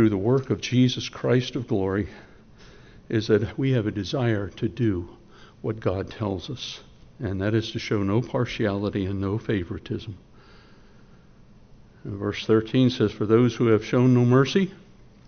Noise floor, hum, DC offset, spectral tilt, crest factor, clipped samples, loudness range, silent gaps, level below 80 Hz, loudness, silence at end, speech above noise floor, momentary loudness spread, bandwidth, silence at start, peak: -51 dBFS; none; under 0.1%; -6.5 dB/octave; 18 dB; under 0.1%; 8 LU; none; -52 dBFS; -24 LUFS; 0.5 s; 27 dB; 13 LU; 6.6 kHz; 0 s; -6 dBFS